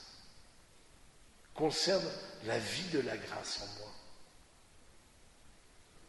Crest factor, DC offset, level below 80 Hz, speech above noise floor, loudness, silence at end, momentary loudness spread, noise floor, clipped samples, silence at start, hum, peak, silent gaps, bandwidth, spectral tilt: 20 dB; under 0.1%; -66 dBFS; 24 dB; -36 LUFS; 0 s; 24 LU; -61 dBFS; under 0.1%; 0 s; none; -20 dBFS; none; 11.5 kHz; -3.5 dB/octave